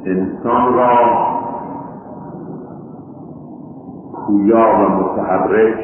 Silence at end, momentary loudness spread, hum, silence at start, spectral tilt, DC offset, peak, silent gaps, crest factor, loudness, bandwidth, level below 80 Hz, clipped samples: 0 s; 22 LU; none; 0 s; -12.5 dB/octave; under 0.1%; 0 dBFS; none; 16 dB; -14 LUFS; 3.3 kHz; -48 dBFS; under 0.1%